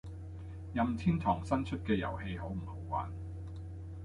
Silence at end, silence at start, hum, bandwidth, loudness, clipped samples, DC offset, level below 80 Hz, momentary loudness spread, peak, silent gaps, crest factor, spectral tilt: 0 s; 0.05 s; none; 11 kHz; -36 LUFS; under 0.1%; under 0.1%; -48 dBFS; 14 LU; -16 dBFS; none; 20 dB; -8 dB/octave